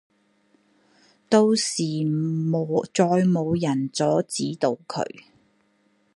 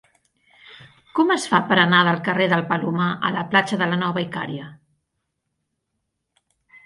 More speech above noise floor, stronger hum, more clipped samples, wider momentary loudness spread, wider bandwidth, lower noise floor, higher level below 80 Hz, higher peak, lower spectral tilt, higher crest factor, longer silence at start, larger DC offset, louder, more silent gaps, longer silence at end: second, 43 dB vs 57 dB; neither; neither; second, 8 LU vs 12 LU; about the same, 11.5 kHz vs 11.5 kHz; second, -65 dBFS vs -77 dBFS; about the same, -64 dBFS vs -66 dBFS; about the same, -4 dBFS vs -2 dBFS; about the same, -5.5 dB/octave vs -5.5 dB/octave; about the same, 20 dB vs 20 dB; first, 1.3 s vs 0.7 s; neither; second, -23 LUFS vs -20 LUFS; neither; second, 0.95 s vs 2.1 s